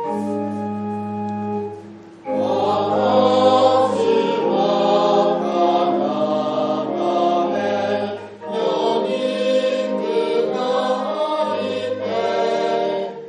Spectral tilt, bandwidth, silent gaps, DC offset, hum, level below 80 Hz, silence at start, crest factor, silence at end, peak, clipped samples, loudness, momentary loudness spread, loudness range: -6 dB/octave; 10 kHz; none; under 0.1%; none; -68 dBFS; 0 s; 16 dB; 0 s; -2 dBFS; under 0.1%; -19 LUFS; 10 LU; 4 LU